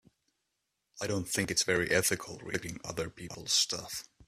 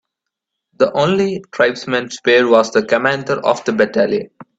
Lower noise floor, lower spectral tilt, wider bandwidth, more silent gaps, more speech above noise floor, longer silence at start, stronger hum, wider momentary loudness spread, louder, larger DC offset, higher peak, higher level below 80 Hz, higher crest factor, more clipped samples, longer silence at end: about the same, -83 dBFS vs -80 dBFS; second, -2.5 dB/octave vs -5 dB/octave; first, 15.5 kHz vs 8 kHz; neither; second, 50 dB vs 64 dB; first, 0.95 s vs 0.8 s; neither; first, 12 LU vs 7 LU; second, -31 LUFS vs -15 LUFS; neither; second, -12 dBFS vs 0 dBFS; about the same, -62 dBFS vs -58 dBFS; first, 22 dB vs 16 dB; neither; about the same, 0.05 s vs 0.15 s